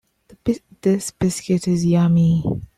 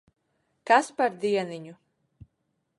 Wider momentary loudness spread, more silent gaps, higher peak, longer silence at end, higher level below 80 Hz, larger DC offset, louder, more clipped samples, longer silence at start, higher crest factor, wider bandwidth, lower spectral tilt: second, 9 LU vs 21 LU; neither; about the same, -6 dBFS vs -6 dBFS; second, 0.15 s vs 1.05 s; first, -46 dBFS vs -70 dBFS; neither; first, -19 LUFS vs -25 LUFS; neither; second, 0.45 s vs 0.65 s; second, 12 dB vs 22 dB; first, 13 kHz vs 11.5 kHz; first, -7 dB/octave vs -4 dB/octave